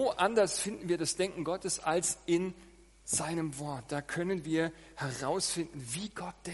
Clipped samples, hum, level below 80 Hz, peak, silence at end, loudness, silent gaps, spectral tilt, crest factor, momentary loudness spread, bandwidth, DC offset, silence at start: under 0.1%; none; -62 dBFS; -14 dBFS; 0 s; -33 LUFS; none; -3.5 dB/octave; 20 dB; 10 LU; 11.5 kHz; under 0.1%; 0 s